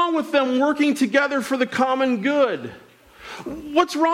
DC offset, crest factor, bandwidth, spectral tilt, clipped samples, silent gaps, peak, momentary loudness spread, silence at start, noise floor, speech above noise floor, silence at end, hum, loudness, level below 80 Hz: under 0.1%; 14 dB; 15.5 kHz; -4.5 dB/octave; under 0.1%; none; -6 dBFS; 14 LU; 0 s; -41 dBFS; 21 dB; 0 s; none; -20 LUFS; -60 dBFS